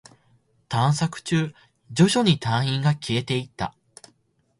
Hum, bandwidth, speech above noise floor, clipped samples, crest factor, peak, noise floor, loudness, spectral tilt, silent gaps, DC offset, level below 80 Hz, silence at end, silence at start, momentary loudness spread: none; 11.5 kHz; 44 dB; under 0.1%; 20 dB; -4 dBFS; -66 dBFS; -23 LUFS; -5.5 dB/octave; none; under 0.1%; -56 dBFS; 0.9 s; 0.7 s; 13 LU